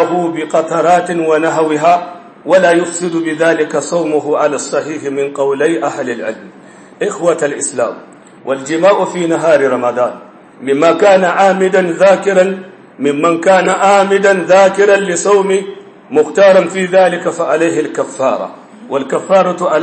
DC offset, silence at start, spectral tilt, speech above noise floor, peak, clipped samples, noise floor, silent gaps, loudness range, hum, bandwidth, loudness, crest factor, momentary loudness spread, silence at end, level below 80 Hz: under 0.1%; 0 s; -4.5 dB/octave; 26 dB; 0 dBFS; under 0.1%; -37 dBFS; none; 6 LU; none; 8.8 kHz; -12 LUFS; 12 dB; 11 LU; 0 s; -68 dBFS